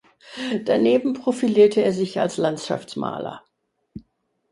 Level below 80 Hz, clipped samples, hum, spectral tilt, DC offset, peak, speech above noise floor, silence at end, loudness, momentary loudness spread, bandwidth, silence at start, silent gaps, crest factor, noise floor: -62 dBFS; under 0.1%; none; -6 dB/octave; under 0.1%; -4 dBFS; 47 dB; 0.5 s; -21 LUFS; 15 LU; 11.5 kHz; 0.25 s; none; 18 dB; -67 dBFS